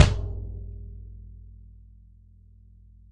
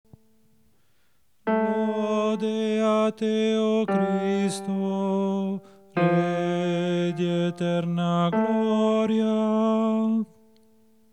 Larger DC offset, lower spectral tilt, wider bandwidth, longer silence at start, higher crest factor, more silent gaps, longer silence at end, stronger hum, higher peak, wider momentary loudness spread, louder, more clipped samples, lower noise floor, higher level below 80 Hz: second, under 0.1% vs 0.1%; second, -5.5 dB/octave vs -7 dB/octave; about the same, 11 kHz vs 11 kHz; second, 0 s vs 1.45 s; first, 26 dB vs 14 dB; neither; first, 1.55 s vs 0.9 s; neither; first, -2 dBFS vs -10 dBFS; first, 22 LU vs 5 LU; second, -31 LUFS vs -24 LUFS; neither; second, -53 dBFS vs -69 dBFS; first, -36 dBFS vs -78 dBFS